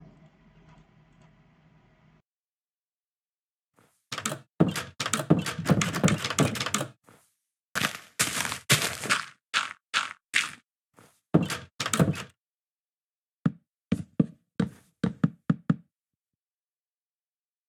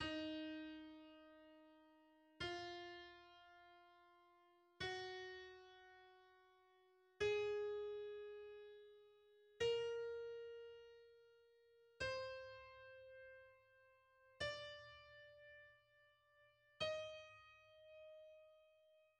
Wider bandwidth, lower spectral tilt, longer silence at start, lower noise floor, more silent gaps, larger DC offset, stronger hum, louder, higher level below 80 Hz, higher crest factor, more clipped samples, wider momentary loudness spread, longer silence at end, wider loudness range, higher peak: first, over 20 kHz vs 9.4 kHz; about the same, -4 dB/octave vs -4 dB/octave; first, 4.1 s vs 0 s; first, under -90 dBFS vs -75 dBFS; first, 7.62-7.75 s, 9.87-9.93 s, 10.24-10.29 s, 10.71-10.75 s, 11.75-11.79 s, 12.40-13.25 s, 13.32-13.43 s, 13.68-13.72 s vs none; neither; neither; first, -28 LUFS vs -49 LUFS; first, -62 dBFS vs -78 dBFS; first, 26 dB vs 20 dB; neither; second, 8 LU vs 22 LU; first, 1.9 s vs 0.15 s; about the same, 6 LU vs 7 LU; first, -4 dBFS vs -32 dBFS